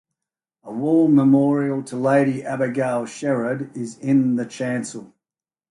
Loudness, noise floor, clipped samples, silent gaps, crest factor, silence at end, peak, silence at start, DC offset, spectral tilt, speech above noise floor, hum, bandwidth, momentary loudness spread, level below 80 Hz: -20 LUFS; under -90 dBFS; under 0.1%; none; 14 dB; 0.65 s; -6 dBFS; 0.65 s; under 0.1%; -7 dB/octave; over 70 dB; none; 11.5 kHz; 13 LU; -66 dBFS